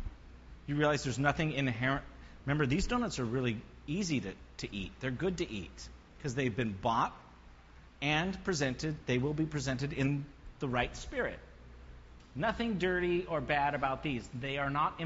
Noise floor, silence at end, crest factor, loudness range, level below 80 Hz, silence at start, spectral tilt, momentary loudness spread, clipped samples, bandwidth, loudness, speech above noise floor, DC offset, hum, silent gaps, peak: -56 dBFS; 0 s; 20 dB; 4 LU; -50 dBFS; 0 s; -4.5 dB/octave; 13 LU; under 0.1%; 7.6 kHz; -34 LUFS; 22 dB; under 0.1%; none; none; -14 dBFS